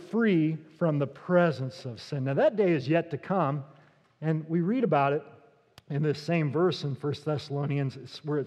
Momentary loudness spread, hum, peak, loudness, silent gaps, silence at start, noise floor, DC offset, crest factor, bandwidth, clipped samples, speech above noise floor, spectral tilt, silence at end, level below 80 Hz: 10 LU; none; -10 dBFS; -28 LUFS; none; 0 s; -58 dBFS; under 0.1%; 18 dB; 9.4 kHz; under 0.1%; 30 dB; -8 dB/octave; 0 s; -78 dBFS